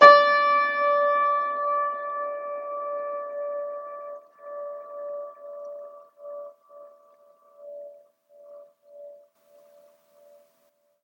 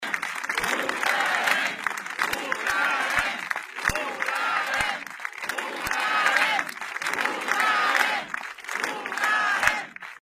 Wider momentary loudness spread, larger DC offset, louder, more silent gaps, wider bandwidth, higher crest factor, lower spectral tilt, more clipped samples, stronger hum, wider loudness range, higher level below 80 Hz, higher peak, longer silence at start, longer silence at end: first, 24 LU vs 9 LU; neither; about the same, -24 LUFS vs -25 LUFS; neither; second, 7.2 kHz vs 15.5 kHz; about the same, 24 dB vs 24 dB; first, -3 dB/octave vs -1 dB/octave; neither; neither; first, 24 LU vs 2 LU; second, under -90 dBFS vs -54 dBFS; about the same, 0 dBFS vs -2 dBFS; about the same, 0 s vs 0 s; first, 1.9 s vs 0.05 s